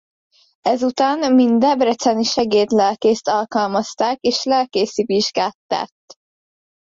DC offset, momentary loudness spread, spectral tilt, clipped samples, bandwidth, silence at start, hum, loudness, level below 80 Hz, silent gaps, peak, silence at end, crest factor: under 0.1%; 7 LU; -4 dB/octave; under 0.1%; 7.8 kHz; 0.65 s; none; -18 LUFS; -60 dBFS; 5.54-5.69 s; -4 dBFS; 0.95 s; 14 dB